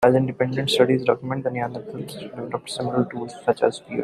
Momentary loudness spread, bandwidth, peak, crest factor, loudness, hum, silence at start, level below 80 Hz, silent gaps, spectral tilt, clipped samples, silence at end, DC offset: 15 LU; 14 kHz; -4 dBFS; 20 dB; -23 LUFS; none; 0 s; -60 dBFS; none; -6 dB/octave; under 0.1%; 0 s; under 0.1%